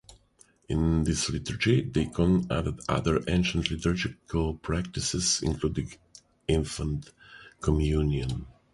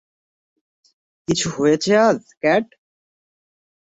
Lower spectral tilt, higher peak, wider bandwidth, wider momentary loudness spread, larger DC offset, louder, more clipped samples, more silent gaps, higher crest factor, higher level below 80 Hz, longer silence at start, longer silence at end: about the same, -5 dB/octave vs -4.5 dB/octave; second, -8 dBFS vs -4 dBFS; first, 11.5 kHz vs 8.2 kHz; second, 8 LU vs 11 LU; neither; second, -28 LUFS vs -18 LUFS; neither; second, none vs 2.37-2.41 s; about the same, 20 dB vs 18 dB; first, -38 dBFS vs -56 dBFS; second, 0.1 s vs 1.3 s; second, 0.2 s vs 1.35 s